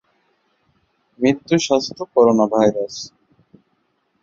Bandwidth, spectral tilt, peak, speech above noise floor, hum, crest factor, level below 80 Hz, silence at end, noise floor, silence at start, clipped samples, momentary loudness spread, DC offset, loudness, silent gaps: 7.8 kHz; -5 dB/octave; -2 dBFS; 50 dB; none; 18 dB; -60 dBFS; 1.15 s; -67 dBFS; 1.2 s; under 0.1%; 14 LU; under 0.1%; -18 LUFS; none